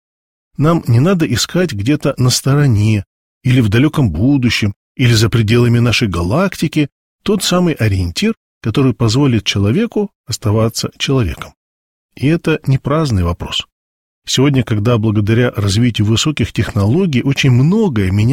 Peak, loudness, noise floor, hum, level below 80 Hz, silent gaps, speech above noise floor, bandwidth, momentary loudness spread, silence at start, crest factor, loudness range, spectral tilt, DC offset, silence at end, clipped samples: -2 dBFS; -14 LUFS; under -90 dBFS; none; -36 dBFS; 3.06-3.41 s, 4.76-4.95 s, 6.92-7.19 s, 8.37-8.61 s, 10.15-10.24 s, 11.56-12.09 s, 13.72-14.22 s; over 77 dB; 16.5 kHz; 7 LU; 0.6 s; 12 dB; 4 LU; -5.5 dB/octave; under 0.1%; 0 s; under 0.1%